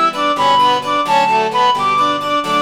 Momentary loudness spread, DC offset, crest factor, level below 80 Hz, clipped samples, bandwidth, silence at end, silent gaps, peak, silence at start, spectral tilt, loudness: 4 LU; 0.4%; 10 dB; -58 dBFS; under 0.1%; 17 kHz; 0 s; none; -2 dBFS; 0 s; -3 dB/octave; -14 LUFS